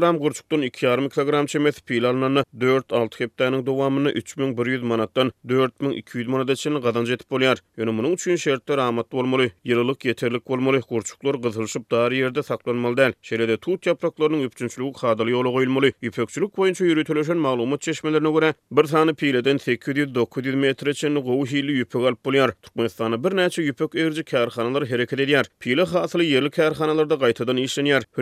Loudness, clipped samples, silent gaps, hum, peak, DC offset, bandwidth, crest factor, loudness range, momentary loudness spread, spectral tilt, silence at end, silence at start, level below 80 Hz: -22 LUFS; under 0.1%; none; none; -4 dBFS; under 0.1%; 14.5 kHz; 18 dB; 2 LU; 5 LU; -5.5 dB/octave; 0 s; 0 s; -66 dBFS